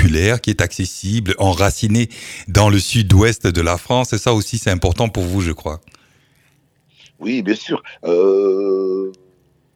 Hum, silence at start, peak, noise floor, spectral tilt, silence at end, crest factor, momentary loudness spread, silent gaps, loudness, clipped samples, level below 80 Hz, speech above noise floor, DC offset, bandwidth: none; 0 s; 0 dBFS; -58 dBFS; -5.5 dB/octave; 0.65 s; 16 dB; 10 LU; none; -17 LUFS; under 0.1%; -32 dBFS; 42 dB; under 0.1%; 16 kHz